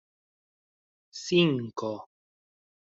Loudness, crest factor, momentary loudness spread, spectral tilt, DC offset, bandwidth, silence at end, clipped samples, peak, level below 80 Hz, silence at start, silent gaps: -27 LUFS; 22 dB; 18 LU; -5.5 dB/octave; under 0.1%; 7.8 kHz; 0.9 s; under 0.1%; -10 dBFS; -72 dBFS; 1.15 s; none